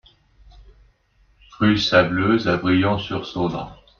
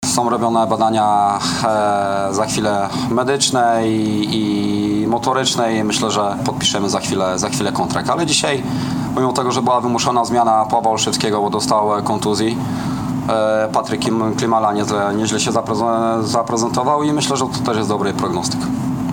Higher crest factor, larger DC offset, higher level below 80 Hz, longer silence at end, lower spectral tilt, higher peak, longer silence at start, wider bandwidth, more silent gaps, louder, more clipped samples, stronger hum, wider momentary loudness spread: about the same, 20 dB vs 16 dB; neither; about the same, -48 dBFS vs -48 dBFS; first, 0.25 s vs 0 s; first, -6 dB/octave vs -4.5 dB/octave; about the same, -2 dBFS vs 0 dBFS; first, 0.6 s vs 0 s; second, 7.2 kHz vs 18 kHz; neither; about the same, -19 LUFS vs -17 LUFS; neither; neither; first, 9 LU vs 4 LU